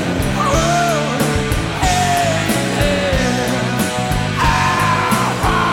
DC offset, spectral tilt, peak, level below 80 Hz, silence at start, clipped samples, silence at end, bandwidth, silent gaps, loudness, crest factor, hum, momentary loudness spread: under 0.1%; -4.5 dB/octave; 0 dBFS; -28 dBFS; 0 s; under 0.1%; 0 s; 18 kHz; none; -16 LUFS; 14 dB; none; 4 LU